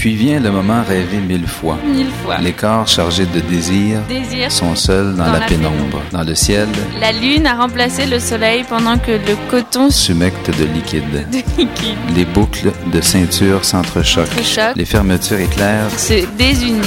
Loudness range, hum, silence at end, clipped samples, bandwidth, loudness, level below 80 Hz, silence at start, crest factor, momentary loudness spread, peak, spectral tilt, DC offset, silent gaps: 2 LU; none; 0 s; under 0.1%; 16.5 kHz; -14 LUFS; -26 dBFS; 0 s; 14 dB; 6 LU; 0 dBFS; -4.5 dB/octave; under 0.1%; none